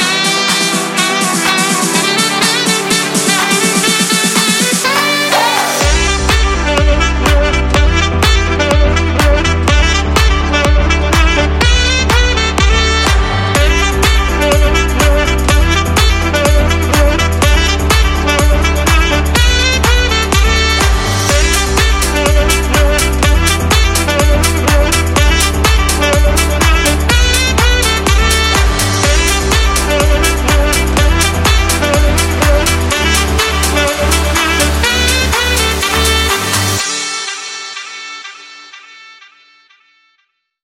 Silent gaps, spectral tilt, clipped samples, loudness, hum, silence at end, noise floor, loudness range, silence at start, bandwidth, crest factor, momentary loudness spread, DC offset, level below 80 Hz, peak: none; -3.5 dB/octave; under 0.1%; -11 LUFS; none; 1.55 s; -62 dBFS; 1 LU; 0 s; 16.5 kHz; 10 dB; 2 LU; under 0.1%; -14 dBFS; 0 dBFS